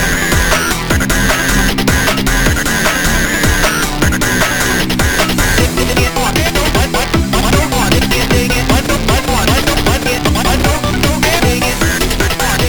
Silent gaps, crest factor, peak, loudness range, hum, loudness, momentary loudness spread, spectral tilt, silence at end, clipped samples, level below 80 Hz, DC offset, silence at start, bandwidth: none; 12 dB; 0 dBFS; 0 LU; none; -12 LUFS; 2 LU; -3.5 dB/octave; 0 s; under 0.1%; -20 dBFS; under 0.1%; 0 s; over 20 kHz